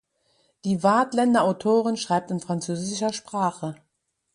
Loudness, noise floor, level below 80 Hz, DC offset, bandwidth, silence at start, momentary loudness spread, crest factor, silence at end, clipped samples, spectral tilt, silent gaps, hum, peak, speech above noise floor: -24 LUFS; -76 dBFS; -68 dBFS; under 0.1%; 11 kHz; 0.65 s; 8 LU; 18 dB; 0.6 s; under 0.1%; -5.5 dB/octave; none; none; -6 dBFS; 53 dB